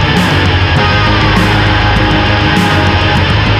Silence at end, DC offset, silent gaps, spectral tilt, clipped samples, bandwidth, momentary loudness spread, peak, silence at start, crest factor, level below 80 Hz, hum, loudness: 0 s; under 0.1%; none; -5.5 dB/octave; under 0.1%; 14 kHz; 1 LU; 0 dBFS; 0 s; 8 dB; -20 dBFS; none; -9 LUFS